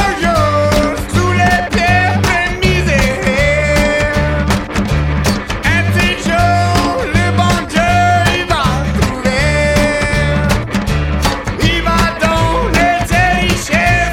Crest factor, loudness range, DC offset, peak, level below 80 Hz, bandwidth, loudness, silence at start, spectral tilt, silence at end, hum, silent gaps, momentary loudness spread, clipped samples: 12 dB; 1 LU; under 0.1%; 0 dBFS; -22 dBFS; 17 kHz; -13 LUFS; 0 s; -5 dB/octave; 0 s; none; none; 4 LU; under 0.1%